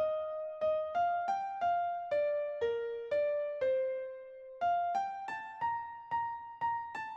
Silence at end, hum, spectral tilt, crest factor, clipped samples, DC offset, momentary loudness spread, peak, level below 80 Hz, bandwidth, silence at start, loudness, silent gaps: 0 s; none; -4.5 dB/octave; 12 dB; under 0.1%; under 0.1%; 8 LU; -24 dBFS; -74 dBFS; 8 kHz; 0 s; -35 LUFS; none